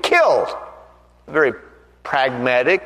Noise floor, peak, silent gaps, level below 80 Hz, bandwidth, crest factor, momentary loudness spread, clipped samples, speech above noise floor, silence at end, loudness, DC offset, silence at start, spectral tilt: -47 dBFS; -2 dBFS; none; -54 dBFS; 13 kHz; 18 dB; 22 LU; under 0.1%; 30 dB; 0 s; -18 LUFS; under 0.1%; 0.05 s; -4 dB/octave